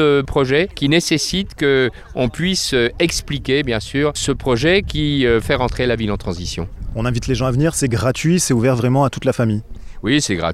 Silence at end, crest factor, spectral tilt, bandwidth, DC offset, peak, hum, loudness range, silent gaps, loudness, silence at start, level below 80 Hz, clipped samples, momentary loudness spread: 0 s; 16 dB; -5 dB/octave; 15.5 kHz; under 0.1%; -2 dBFS; none; 1 LU; none; -18 LUFS; 0 s; -32 dBFS; under 0.1%; 7 LU